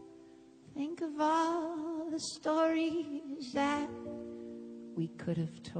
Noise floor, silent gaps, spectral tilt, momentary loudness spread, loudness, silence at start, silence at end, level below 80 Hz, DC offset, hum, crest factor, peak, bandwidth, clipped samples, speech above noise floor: -57 dBFS; none; -5.5 dB/octave; 15 LU; -35 LUFS; 0 s; 0 s; -72 dBFS; under 0.1%; none; 16 dB; -20 dBFS; 9.4 kHz; under 0.1%; 23 dB